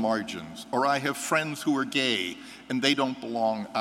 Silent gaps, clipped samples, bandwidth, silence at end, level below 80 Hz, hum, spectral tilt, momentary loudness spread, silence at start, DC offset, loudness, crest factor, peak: none; under 0.1%; 16 kHz; 0 s; -70 dBFS; none; -3.5 dB/octave; 9 LU; 0 s; under 0.1%; -27 LUFS; 20 dB; -6 dBFS